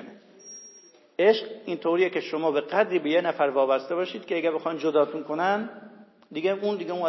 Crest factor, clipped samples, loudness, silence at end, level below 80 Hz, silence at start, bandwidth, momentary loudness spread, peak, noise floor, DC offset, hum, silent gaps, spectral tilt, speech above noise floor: 18 dB; under 0.1%; -25 LUFS; 0 s; -90 dBFS; 0 s; 6 kHz; 16 LU; -8 dBFS; -53 dBFS; under 0.1%; none; none; -5.5 dB/octave; 28 dB